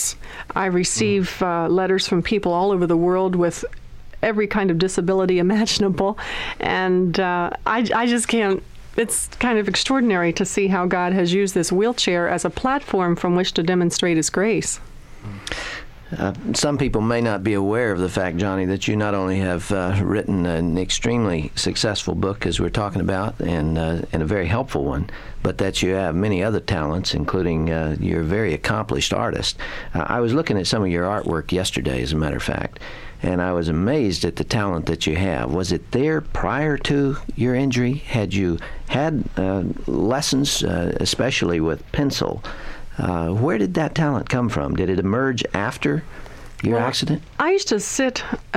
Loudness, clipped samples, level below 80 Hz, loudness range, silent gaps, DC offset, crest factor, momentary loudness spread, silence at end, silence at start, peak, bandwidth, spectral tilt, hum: -21 LUFS; under 0.1%; -36 dBFS; 3 LU; none; under 0.1%; 14 dB; 7 LU; 0 s; 0 s; -6 dBFS; 15.5 kHz; -5 dB/octave; none